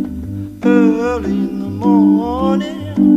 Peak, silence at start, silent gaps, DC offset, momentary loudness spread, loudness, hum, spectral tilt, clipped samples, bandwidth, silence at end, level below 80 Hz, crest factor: -2 dBFS; 0 s; none; under 0.1%; 10 LU; -15 LUFS; none; -8 dB/octave; under 0.1%; 7.8 kHz; 0 s; -36 dBFS; 12 dB